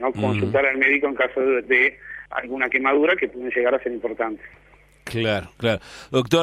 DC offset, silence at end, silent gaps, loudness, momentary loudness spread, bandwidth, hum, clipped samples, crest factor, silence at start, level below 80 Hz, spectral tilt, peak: under 0.1%; 0 s; none; -21 LUFS; 11 LU; 15 kHz; 50 Hz at -55 dBFS; under 0.1%; 18 dB; 0 s; -54 dBFS; -5.5 dB/octave; -4 dBFS